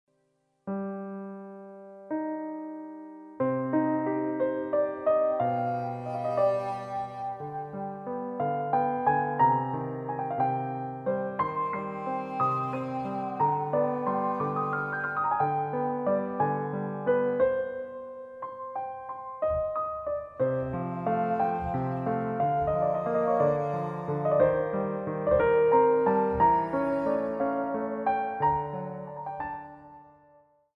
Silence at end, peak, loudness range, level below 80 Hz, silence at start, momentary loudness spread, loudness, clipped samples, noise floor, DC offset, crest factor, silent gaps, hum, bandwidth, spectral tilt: 0.7 s; -10 dBFS; 6 LU; -56 dBFS; 0.65 s; 13 LU; -29 LUFS; under 0.1%; -73 dBFS; under 0.1%; 18 dB; none; none; 6.6 kHz; -9.5 dB/octave